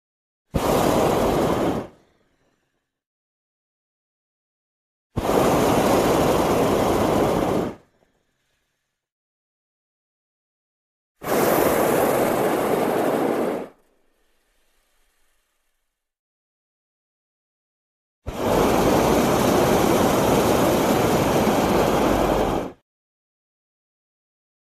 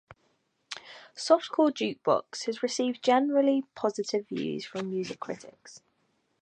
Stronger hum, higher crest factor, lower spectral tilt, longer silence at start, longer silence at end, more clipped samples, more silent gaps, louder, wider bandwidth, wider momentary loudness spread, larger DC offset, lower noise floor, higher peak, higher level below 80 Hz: neither; about the same, 18 dB vs 22 dB; about the same, -5 dB/octave vs -4.5 dB/octave; second, 0.55 s vs 0.7 s; first, 1.95 s vs 0.65 s; neither; first, 3.06-5.10 s, 9.12-11.15 s, 16.19-18.22 s vs none; first, -20 LUFS vs -28 LUFS; first, 14 kHz vs 9.6 kHz; second, 9 LU vs 17 LU; neither; about the same, -76 dBFS vs -73 dBFS; first, -4 dBFS vs -8 dBFS; first, -42 dBFS vs -76 dBFS